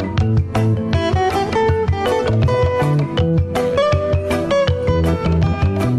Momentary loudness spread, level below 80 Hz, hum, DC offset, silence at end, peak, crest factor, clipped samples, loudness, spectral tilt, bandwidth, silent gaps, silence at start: 2 LU; -28 dBFS; none; under 0.1%; 0 s; -4 dBFS; 12 dB; under 0.1%; -17 LUFS; -7.5 dB/octave; 13 kHz; none; 0 s